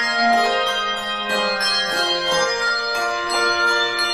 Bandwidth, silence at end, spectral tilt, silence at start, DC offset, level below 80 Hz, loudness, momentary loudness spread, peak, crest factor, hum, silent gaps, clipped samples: 15.5 kHz; 0 s; -1 dB/octave; 0 s; under 0.1%; -54 dBFS; -18 LUFS; 5 LU; -6 dBFS; 14 dB; none; none; under 0.1%